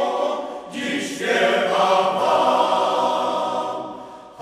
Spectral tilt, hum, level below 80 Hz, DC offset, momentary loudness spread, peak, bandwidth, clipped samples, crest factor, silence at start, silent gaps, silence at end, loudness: -3.5 dB/octave; none; -68 dBFS; under 0.1%; 13 LU; -4 dBFS; 14.5 kHz; under 0.1%; 16 dB; 0 s; none; 0 s; -20 LUFS